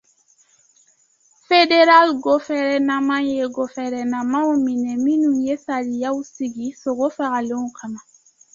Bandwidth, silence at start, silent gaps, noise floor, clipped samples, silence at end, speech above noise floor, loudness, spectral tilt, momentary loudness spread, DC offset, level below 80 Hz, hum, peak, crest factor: 7.6 kHz; 1.5 s; none; -59 dBFS; under 0.1%; 0.55 s; 40 dB; -19 LUFS; -3.5 dB/octave; 14 LU; under 0.1%; -64 dBFS; none; -2 dBFS; 18 dB